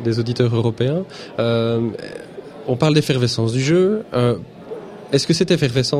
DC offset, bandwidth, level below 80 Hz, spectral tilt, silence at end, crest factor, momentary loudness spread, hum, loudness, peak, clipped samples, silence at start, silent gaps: under 0.1%; 14 kHz; -52 dBFS; -6 dB/octave; 0 s; 16 dB; 17 LU; none; -19 LUFS; -2 dBFS; under 0.1%; 0 s; none